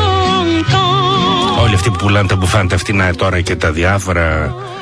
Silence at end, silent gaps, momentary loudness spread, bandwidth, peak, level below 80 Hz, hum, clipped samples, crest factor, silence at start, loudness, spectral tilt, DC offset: 0 s; none; 3 LU; 11 kHz; -2 dBFS; -28 dBFS; none; under 0.1%; 12 dB; 0 s; -13 LUFS; -5 dB/octave; 0.2%